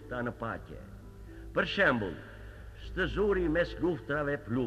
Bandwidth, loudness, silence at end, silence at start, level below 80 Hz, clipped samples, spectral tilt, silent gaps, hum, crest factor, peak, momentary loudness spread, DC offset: 13.5 kHz; -31 LUFS; 0 s; 0 s; -46 dBFS; under 0.1%; -7 dB/octave; none; none; 18 dB; -14 dBFS; 22 LU; under 0.1%